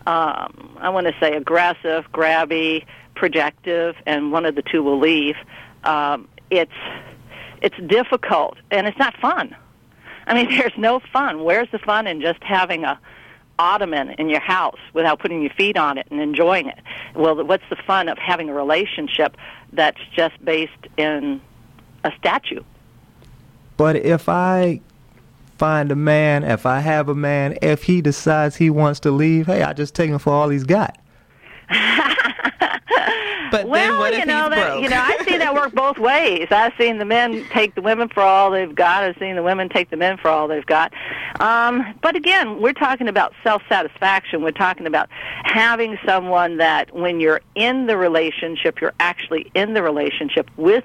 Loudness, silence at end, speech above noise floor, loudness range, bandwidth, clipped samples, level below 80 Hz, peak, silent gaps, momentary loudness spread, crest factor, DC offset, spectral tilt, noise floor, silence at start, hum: -18 LUFS; 0 s; 30 dB; 4 LU; 15 kHz; under 0.1%; -52 dBFS; -4 dBFS; none; 7 LU; 14 dB; under 0.1%; -6 dB/octave; -49 dBFS; 0.05 s; none